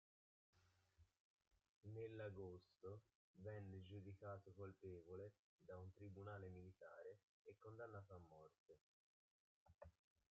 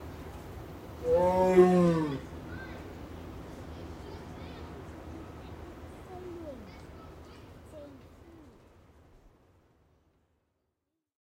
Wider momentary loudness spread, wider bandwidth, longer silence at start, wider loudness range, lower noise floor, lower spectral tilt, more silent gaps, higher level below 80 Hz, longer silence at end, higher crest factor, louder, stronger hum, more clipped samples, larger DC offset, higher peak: second, 12 LU vs 25 LU; second, 7 kHz vs 16 kHz; first, 0.55 s vs 0 s; second, 6 LU vs 24 LU; second, -79 dBFS vs -84 dBFS; about the same, -7 dB/octave vs -8 dB/octave; first, 1.20-1.39 s, 1.69-1.81 s, 3.15-3.34 s, 5.39-5.59 s, 7.23-7.45 s, 8.58-8.66 s, 8.81-9.66 s, 9.75-9.79 s vs none; second, -86 dBFS vs -52 dBFS; second, 0.4 s vs 3.45 s; second, 18 dB vs 24 dB; second, -60 LUFS vs -27 LUFS; neither; neither; neither; second, -44 dBFS vs -10 dBFS